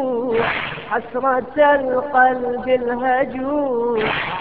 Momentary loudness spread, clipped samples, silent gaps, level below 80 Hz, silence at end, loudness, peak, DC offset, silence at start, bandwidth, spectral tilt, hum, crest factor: 7 LU; under 0.1%; none; -50 dBFS; 0 s; -19 LUFS; -2 dBFS; 0.5%; 0 s; 4.8 kHz; -8.5 dB/octave; none; 16 dB